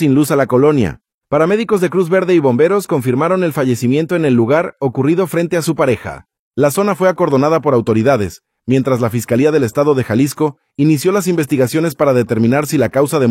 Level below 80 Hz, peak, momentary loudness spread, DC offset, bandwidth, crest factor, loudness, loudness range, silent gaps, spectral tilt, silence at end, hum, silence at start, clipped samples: -50 dBFS; 0 dBFS; 5 LU; under 0.1%; 16.5 kHz; 12 dB; -14 LUFS; 1 LU; 1.14-1.18 s, 6.39-6.51 s; -6.5 dB/octave; 0 s; none; 0 s; under 0.1%